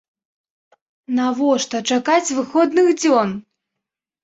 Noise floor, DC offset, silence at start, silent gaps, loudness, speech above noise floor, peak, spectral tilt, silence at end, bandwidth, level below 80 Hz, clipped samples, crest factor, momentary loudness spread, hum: -83 dBFS; under 0.1%; 1.1 s; none; -18 LUFS; 66 dB; -4 dBFS; -3.5 dB/octave; 0.8 s; 8 kHz; -66 dBFS; under 0.1%; 16 dB; 8 LU; none